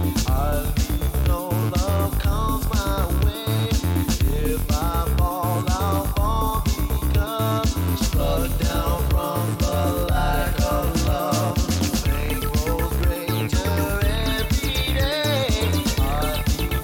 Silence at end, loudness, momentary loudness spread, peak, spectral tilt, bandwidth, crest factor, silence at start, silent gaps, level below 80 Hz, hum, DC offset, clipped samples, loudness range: 0 s; -22 LUFS; 2 LU; -10 dBFS; -5.5 dB/octave; 17.5 kHz; 12 dB; 0 s; none; -24 dBFS; none; under 0.1%; under 0.1%; 1 LU